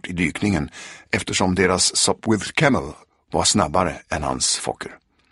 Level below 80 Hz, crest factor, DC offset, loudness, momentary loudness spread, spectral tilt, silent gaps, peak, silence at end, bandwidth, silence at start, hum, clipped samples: -44 dBFS; 20 dB; under 0.1%; -20 LUFS; 13 LU; -3.5 dB/octave; none; -2 dBFS; 0.35 s; 11.5 kHz; 0.05 s; none; under 0.1%